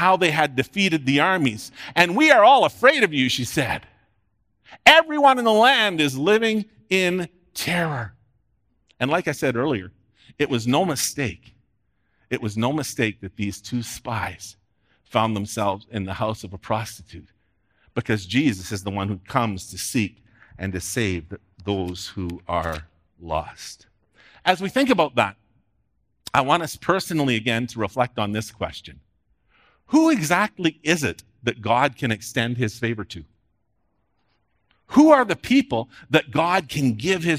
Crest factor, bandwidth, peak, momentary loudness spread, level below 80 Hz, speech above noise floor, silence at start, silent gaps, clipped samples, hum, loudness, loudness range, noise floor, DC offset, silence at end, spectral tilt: 22 dB; 16 kHz; 0 dBFS; 15 LU; -56 dBFS; 50 dB; 0 s; none; under 0.1%; none; -21 LUFS; 10 LU; -71 dBFS; under 0.1%; 0 s; -4.5 dB/octave